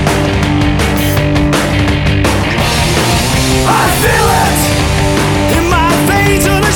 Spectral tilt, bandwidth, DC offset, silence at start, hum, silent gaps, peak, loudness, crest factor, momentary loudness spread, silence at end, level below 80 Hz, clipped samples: -4.5 dB/octave; over 20 kHz; under 0.1%; 0 s; none; none; 0 dBFS; -10 LUFS; 10 dB; 2 LU; 0 s; -20 dBFS; under 0.1%